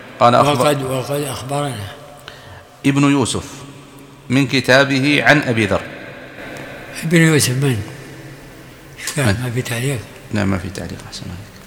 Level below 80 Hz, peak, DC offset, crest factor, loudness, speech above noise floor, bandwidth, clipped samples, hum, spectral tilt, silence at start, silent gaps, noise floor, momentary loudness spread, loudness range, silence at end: -50 dBFS; 0 dBFS; under 0.1%; 18 dB; -16 LUFS; 23 dB; 18 kHz; under 0.1%; none; -5 dB/octave; 0 s; none; -39 dBFS; 23 LU; 7 LU; 0 s